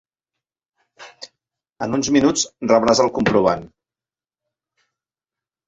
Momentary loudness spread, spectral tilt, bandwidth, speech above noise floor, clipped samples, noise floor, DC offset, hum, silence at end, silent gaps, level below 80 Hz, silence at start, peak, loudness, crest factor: 14 LU; -4 dB/octave; 8.4 kHz; over 73 dB; under 0.1%; under -90 dBFS; under 0.1%; none; 2 s; none; -52 dBFS; 1 s; -2 dBFS; -18 LUFS; 20 dB